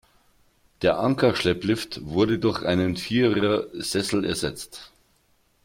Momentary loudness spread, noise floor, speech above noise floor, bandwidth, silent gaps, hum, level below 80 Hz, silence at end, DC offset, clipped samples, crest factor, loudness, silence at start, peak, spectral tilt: 7 LU; -65 dBFS; 41 dB; 16.5 kHz; none; none; -52 dBFS; 0.8 s; under 0.1%; under 0.1%; 18 dB; -24 LUFS; 0.8 s; -8 dBFS; -5 dB/octave